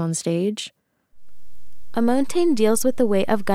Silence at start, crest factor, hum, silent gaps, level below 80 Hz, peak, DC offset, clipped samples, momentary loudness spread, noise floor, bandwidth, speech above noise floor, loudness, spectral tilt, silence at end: 0 s; 16 dB; none; none; -56 dBFS; -6 dBFS; under 0.1%; under 0.1%; 11 LU; -48 dBFS; 16 kHz; 28 dB; -21 LUFS; -5 dB/octave; 0 s